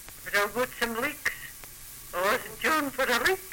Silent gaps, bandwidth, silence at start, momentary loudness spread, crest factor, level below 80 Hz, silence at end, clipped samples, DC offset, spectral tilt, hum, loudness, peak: none; 17 kHz; 0 s; 16 LU; 16 dB; -54 dBFS; 0 s; under 0.1%; under 0.1%; -2 dB/octave; none; -28 LUFS; -14 dBFS